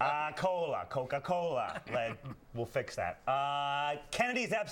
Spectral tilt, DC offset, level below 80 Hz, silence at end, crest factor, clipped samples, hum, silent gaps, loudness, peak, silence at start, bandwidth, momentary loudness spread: -4.5 dB/octave; under 0.1%; -64 dBFS; 0 s; 18 dB; under 0.1%; none; none; -35 LUFS; -16 dBFS; 0 s; 17 kHz; 6 LU